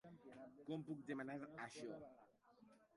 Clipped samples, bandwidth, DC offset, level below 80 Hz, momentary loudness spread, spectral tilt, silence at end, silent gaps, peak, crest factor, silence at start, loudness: under 0.1%; 11 kHz; under 0.1%; -88 dBFS; 12 LU; -6 dB/octave; 0 s; none; -36 dBFS; 18 dB; 0.05 s; -53 LUFS